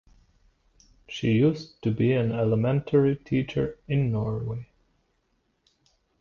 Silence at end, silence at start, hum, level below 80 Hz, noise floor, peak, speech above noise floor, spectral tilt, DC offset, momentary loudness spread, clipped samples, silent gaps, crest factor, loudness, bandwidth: 1.55 s; 1.1 s; none; -52 dBFS; -72 dBFS; -10 dBFS; 47 dB; -8.5 dB/octave; under 0.1%; 9 LU; under 0.1%; none; 16 dB; -26 LUFS; 7 kHz